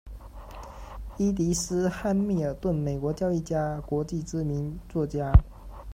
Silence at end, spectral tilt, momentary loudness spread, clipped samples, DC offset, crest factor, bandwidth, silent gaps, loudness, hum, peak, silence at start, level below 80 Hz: 0 s; -6.5 dB/octave; 21 LU; under 0.1%; under 0.1%; 24 dB; 15.5 kHz; none; -28 LUFS; none; -4 dBFS; 0.05 s; -34 dBFS